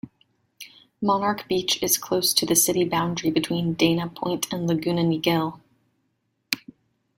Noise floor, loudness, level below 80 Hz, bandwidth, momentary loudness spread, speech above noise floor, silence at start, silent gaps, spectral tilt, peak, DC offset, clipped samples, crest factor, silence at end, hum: -73 dBFS; -23 LUFS; -60 dBFS; 16.5 kHz; 11 LU; 50 dB; 0.05 s; none; -3.5 dB/octave; 0 dBFS; under 0.1%; under 0.1%; 24 dB; 0.6 s; none